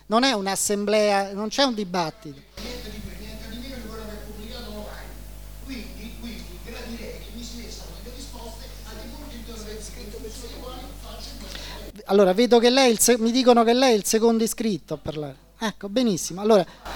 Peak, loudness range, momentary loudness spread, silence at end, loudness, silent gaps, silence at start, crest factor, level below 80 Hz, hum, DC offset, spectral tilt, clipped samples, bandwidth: -2 dBFS; 19 LU; 21 LU; 0 s; -21 LUFS; none; 0.1 s; 22 dB; -42 dBFS; 50 Hz at -40 dBFS; 0.5%; -3.5 dB/octave; under 0.1%; over 20 kHz